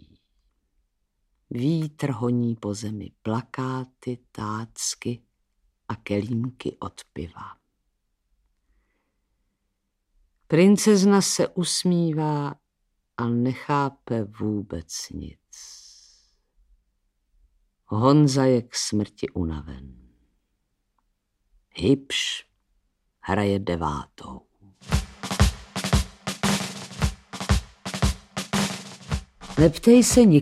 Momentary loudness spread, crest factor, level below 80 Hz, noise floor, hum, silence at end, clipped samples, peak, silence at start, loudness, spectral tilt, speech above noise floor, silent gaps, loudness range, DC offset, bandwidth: 20 LU; 22 dB; -40 dBFS; -76 dBFS; none; 0 s; under 0.1%; -4 dBFS; 1.5 s; -24 LUFS; -5 dB/octave; 54 dB; none; 12 LU; under 0.1%; 15.5 kHz